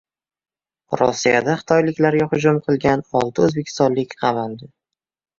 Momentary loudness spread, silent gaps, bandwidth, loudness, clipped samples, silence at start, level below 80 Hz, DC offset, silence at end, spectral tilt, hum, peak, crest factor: 5 LU; none; 7.6 kHz; -18 LUFS; under 0.1%; 0.9 s; -54 dBFS; under 0.1%; 0.75 s; -6 dB/octave; none; -2 dBFS; 18 dB